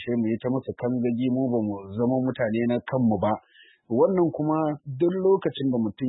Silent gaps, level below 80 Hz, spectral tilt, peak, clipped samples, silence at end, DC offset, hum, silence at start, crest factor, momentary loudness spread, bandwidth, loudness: none; -62 dBFS; -12 dB/octave; -8 dBFS; under 0.1%; 0 s; under 0.1%; none; 0 s; 16 dB; 6 LU; 4.1 kHz; -25 LUFS